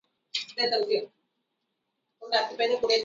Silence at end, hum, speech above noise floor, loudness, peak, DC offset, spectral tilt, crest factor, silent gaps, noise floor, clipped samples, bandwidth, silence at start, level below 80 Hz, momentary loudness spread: 0 s; none; 54 dB; -28 LUFS; -12 dBFS; under 0.1%; -1.5 dB/octave; 18 dB; none; -80 dBFS; under 0.1%; 7.8 kHz; 0.35 s; -76 dBFS; 9 LU